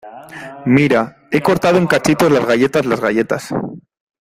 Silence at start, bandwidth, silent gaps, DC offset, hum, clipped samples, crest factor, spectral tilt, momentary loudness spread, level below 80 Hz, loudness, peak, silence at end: 0.05 s; 16 kHz; none; under 0.1%; none; under 0.1%; 16 dB; -6 dB/octave; 14 LU; -50 dBFS; -15 LUFS; 0 dBFS; 0.4 s